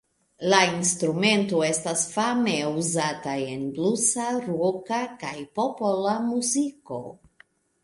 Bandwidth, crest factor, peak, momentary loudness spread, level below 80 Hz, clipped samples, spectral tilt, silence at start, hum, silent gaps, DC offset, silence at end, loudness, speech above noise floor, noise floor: 11.5 kHz; 22 dB; -4 dBFS; 10 LU; -66 dBFS; under 0.1%; -3.5 dB/octave; 0.4 s; none; none; under 0.1%; 0.7 s; -24 LUFS; 34 dB; -59 dBFS